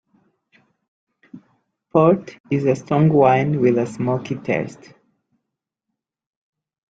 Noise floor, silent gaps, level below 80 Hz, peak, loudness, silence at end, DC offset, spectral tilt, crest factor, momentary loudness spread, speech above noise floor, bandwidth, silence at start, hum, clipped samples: -81 dBFS; 2.40-2.44 s; -60 dBFS; -2 dBFS; -18 LUFS; 2.15 s; under 0.1%; -8.5 dB/octave; 20 dB; 10 LU; 64 dB; 8 kHz; 1.35 s; none; under 0.1%